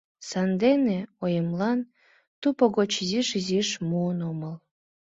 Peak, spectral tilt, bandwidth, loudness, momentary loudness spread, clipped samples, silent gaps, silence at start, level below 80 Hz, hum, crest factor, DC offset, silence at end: -8 dBFS; -5.5 dB/octave; 7.8 kHz; -26 LUFS; 11 LU; under 0.1%; 2.27-2.42 s; 0.2 s; -66 dBFS; none; 20 dB; under 0.1%; 0.55 s